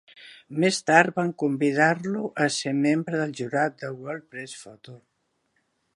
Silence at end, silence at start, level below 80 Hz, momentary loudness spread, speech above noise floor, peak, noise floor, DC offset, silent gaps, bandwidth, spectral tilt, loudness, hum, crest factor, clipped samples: 1 s; 0.2 s; -74 dBFS; 18 LU; 48 dB; -2 dBFS; -73 dBFS; under 0.1%; none; 11.5 kHz; -5 dB/octave; -24 LUFS; none; 24 dB; under 0.1%